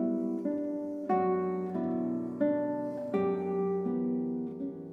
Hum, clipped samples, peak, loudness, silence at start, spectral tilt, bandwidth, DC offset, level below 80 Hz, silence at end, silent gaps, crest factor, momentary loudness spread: none; under 0.1%; -18 dBFS; -32 LUFS; 0 s; -10.5 dB/octave; 4.3 kHz; under 0.1%; -76 dBFS; 0 s; none; 14 dB; 6 LU